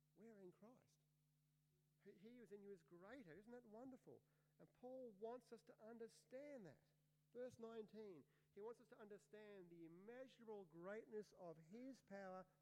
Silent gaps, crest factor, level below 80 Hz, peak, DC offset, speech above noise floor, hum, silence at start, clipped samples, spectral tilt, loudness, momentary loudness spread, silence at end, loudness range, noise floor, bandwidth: none; 16 dB; under -90 dBFS; -44 dBFS; under 0.1%; 24 dB; none; 0 s; under 0.1%; -6 dB/octave; -61 LUFS; 9 LU; 0 s; 5 LU; -85 dBFS; 11 kHz